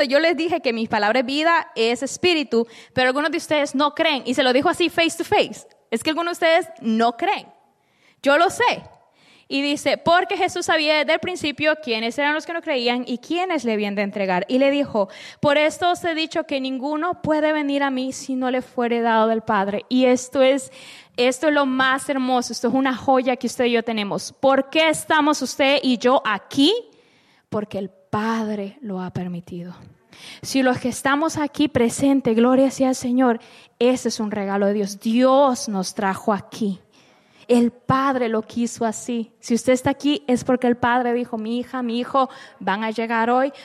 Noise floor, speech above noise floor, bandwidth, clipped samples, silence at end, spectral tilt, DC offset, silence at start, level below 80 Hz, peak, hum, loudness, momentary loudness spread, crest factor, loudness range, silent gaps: -60 dBFS; 39 dB; 13.5 kHz; under 0.1%; 0 s; -4 dB/octave; under 0.1%; 0 s; -60 dBFS; -6 dBFS; none; -20 LUFS; 9 LU; 14 dB; 3 LU; none